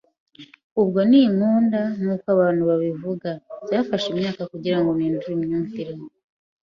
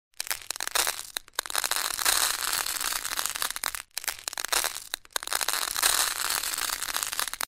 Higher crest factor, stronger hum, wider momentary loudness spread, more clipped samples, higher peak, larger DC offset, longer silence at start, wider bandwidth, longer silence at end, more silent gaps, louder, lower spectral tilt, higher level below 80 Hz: second, 16 dB vs 26 dB; neither; first, 14 LU vs 10 LU; neither; about the same, -4 dBFS vs -4 dBFS; neither; first, 0.4 s vs 0.2 s; second, 7.2 kHz vs 16.5 kHz; first, 0.6 s vs 0 s; first, 0.64-0.76 s vs none; first, -21 LUFS vs -27 LUFS; first, -8 dB/octave vs 2 dB/octave; second, -62 dBFS vs -56 dBFS